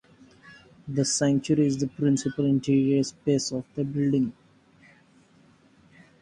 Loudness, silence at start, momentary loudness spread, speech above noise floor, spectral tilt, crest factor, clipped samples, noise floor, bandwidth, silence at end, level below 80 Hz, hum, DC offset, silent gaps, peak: -25 LUFS; 0.45 s; 8 LU; 34 dB; -5.5 dB/octave; 16 dB; under 0.1%; -58 dBFS; 11.5 kHz; 1.9 s; -60 dBFS; none; under 0.1%; none; -12 dBFS